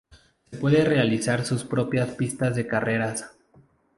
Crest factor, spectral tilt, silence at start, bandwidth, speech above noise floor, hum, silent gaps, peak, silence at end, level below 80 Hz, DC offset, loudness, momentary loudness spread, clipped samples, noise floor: 20 dB; -6 dB/octave; 0.1 s; 11.5 kHz; 35 dB; none; none; -6 dBFS; 0.7 s; -56 dBFS; under 0.1%; -24 LUFS; 9 LU; under 0.1%; -58 dBFS